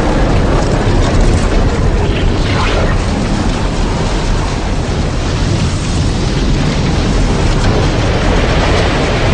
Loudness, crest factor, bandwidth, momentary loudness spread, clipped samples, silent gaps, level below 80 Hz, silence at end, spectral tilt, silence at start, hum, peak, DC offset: -14 LUFS; 10 dB; 10 kHz; 4 LU; under 0.1%; none; -16 dBFS; 0 s; -5.5 dB/octave; 0 s; none; 0 dBFS; under 0.1%